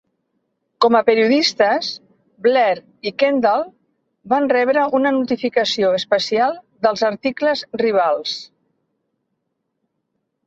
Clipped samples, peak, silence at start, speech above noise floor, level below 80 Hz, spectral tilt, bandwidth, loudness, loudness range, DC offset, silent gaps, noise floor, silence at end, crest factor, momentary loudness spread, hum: under 0.1%; -2 dBFS; 0.8 s; 57 dB; -66 dBFS; -4 dB/octave; 8 kHz; -18 LUFS; 4 LU; under 0.1%; none; -74 dBFS; 2 s; 16 dB; 8 LU; none